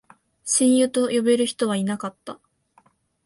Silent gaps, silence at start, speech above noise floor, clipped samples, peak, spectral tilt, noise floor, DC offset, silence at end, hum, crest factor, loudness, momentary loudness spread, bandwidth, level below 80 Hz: none; 0.45 s; 40 dB; under 0.1%; -8 dBFS; -4 dB/octave; -61 dBFS; under 0.1%; 0.9 s; none; 16 dB; -21 LUFS; 18 LU; 11.5 kHz; -68 dBFS